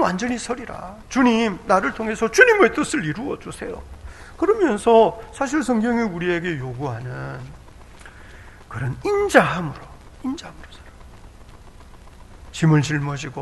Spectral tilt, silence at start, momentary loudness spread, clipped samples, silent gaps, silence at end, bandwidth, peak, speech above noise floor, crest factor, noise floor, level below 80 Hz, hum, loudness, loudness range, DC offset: -5.5 dB/octave; 0 s; 20 LU; under 0.1%; none; 0 s; 12 kHz; 0 dBFS; 23 dB; 22 dB; -43 dBFS; -44 dBFS; none; -20 LUFS; 8 LU; under 0.1%